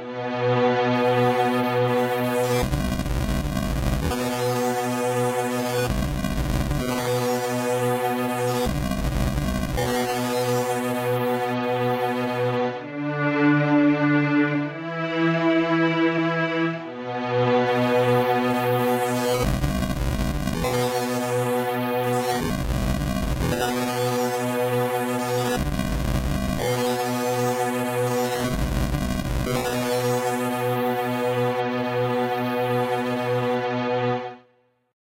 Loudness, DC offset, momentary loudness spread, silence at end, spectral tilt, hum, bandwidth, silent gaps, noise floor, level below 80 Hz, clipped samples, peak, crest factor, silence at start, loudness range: -23 LUFS; under 0.1%; 5 LU; 0.65 s; -5.5 dB/octave; none; 16 kHz; none; -62 dBFS; -34 dBFS; under 0.1%; -10 dBFS; 14 dB; 0 s; 3 LU